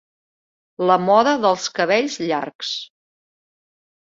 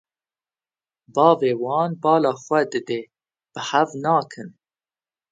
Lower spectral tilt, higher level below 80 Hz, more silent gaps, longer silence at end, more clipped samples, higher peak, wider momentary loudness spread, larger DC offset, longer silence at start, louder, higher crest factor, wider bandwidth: second, -4 dB/octave vs -5.5 dB/octave; about the same, -68 dBFS vs -72 dBFS; first, 2.55-2.59 s vs none; first, 1.3 s vs 0.8 s; neither; about the same, -2 dBFS vs 0 dBFS; second, 11 LU vs 17 LU; neither; second, 0.8 s vs 1.15 s; about the same, -19 LUFS vs -21 LUFS; about the same, 20 dB vs 22 dB; second, 7.8 kHz vs 9 kHz